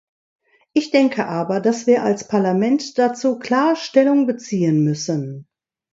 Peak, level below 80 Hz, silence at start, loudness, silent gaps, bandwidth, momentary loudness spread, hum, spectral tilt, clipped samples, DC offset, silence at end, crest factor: -2 dBFS; -66 dBFS; 0.75 s; -18 LUFS; none; 7.8 kHz; 7 LU; none; -6 dB/octave; under 0.1%; under 0.1%; 0.5 s; 18 dB